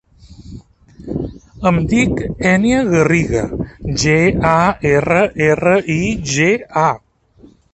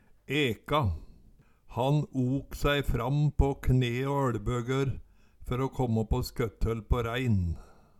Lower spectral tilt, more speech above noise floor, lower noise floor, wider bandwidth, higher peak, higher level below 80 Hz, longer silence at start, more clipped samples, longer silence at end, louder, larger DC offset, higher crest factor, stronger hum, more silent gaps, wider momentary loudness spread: second, -5.5 dB/octave vs -7 dB/octave; about the same, 32 dB vs 30 dB; second, -47 dBFS vs -58 dBFS; second, 8.6 kHz vs 14 kHz; first, 0 dBFS vs -12 dBFS; about the same, -34 dBFS vs -38 dBFS; about the same, 0.3 s vs 0.3 s; neither; first, 0.75 s vs 0.35 s; first, -15 LUFS vs -30 LUFS; neither; about the same, 16 dB vs 18 dB; neither; neither; first, 12 LU vs 7 LU